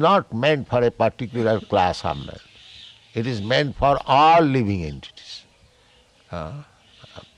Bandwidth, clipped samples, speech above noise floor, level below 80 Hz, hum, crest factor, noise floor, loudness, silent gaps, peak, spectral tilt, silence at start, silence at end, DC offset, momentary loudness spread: 11 kHz; under 0.1%; 36 dB; -46 dBFS; none; 18 dB; -56 dBFS; -20 LUFS; none; -4 dBFS; -6.5 dB/octave; 0 s; 0.15 s; under 0.1%; 23 LU